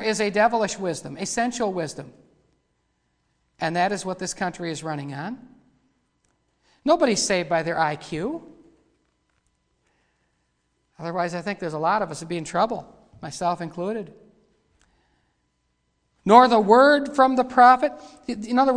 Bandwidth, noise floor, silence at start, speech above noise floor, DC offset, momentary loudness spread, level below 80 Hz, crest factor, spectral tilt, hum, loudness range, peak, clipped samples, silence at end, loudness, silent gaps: 10.5 kHz; -72 dBFS; 0 s; 50 dB; under 0.1%; 18 LU; -60 dBFS; 24 dB; -4.5 dB/octave; none; 15 LU; 0 dBFS; under 0.1%; 0 s; -22 LUFS; none